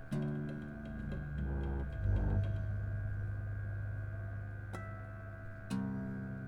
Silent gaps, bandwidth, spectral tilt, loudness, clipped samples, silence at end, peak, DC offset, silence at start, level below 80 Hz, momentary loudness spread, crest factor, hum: none; 11 kHz; -8.5 dB/octave; -40 LUFS; under 0.1%; 0 s; -22 dBFS; under 0.1%; 0 s; -44 dBFS; 10 LU; 16 dB; none